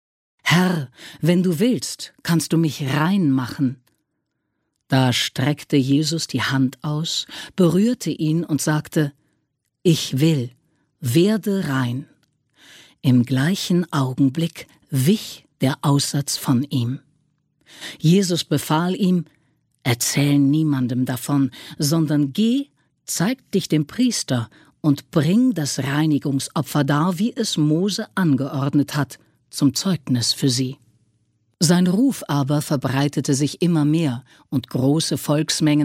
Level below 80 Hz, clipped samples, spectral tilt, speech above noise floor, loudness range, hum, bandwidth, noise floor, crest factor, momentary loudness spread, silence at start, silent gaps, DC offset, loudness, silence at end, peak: -60 dBFS; under 0.1%; -5.5 dB/octave; 56 dB; 2 LU; none; 16 kHz; -75 dBFS; 18 dB; 8 LU; 0.45 s; none; under 0.1%; -20 LUFS; 0 s; -4 dBFS